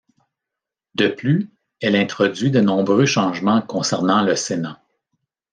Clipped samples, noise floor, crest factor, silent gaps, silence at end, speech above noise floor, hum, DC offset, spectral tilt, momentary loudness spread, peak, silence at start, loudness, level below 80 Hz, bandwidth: under 0.1%; -85 dBFS; 16 dB; none; 0.8 s; 67 dB; none; under 0.1%; -5 dB/octave; 8 LU; -4 dBFS; 1 s; -19 LUFS; -66 dBFS; 10 kHz